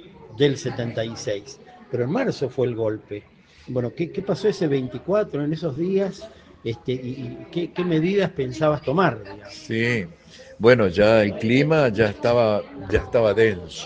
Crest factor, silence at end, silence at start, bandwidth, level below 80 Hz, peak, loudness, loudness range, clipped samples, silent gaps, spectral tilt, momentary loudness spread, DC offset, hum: 22 dB; 0 s; 0 s; 9.2 kHz; -48 dBFS; 0 dBFS; -22 LUFS; 7 LU; under 0.1%; none; -6.5 dB/octave; 15 LU; under 0.1%; none